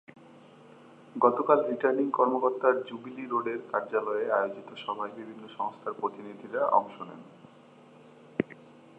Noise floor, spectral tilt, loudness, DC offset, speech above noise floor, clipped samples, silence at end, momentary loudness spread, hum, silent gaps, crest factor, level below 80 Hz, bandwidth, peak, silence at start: -54 dBFS; -7.5 dB/octave; -29 LUFS; under 0.1%; 26 dB; under 0.1%; 0.45 s; 17 LU; none; none; 24 dB; -82 dBFS; 8 kHz; -6 dBFS; 0.35 s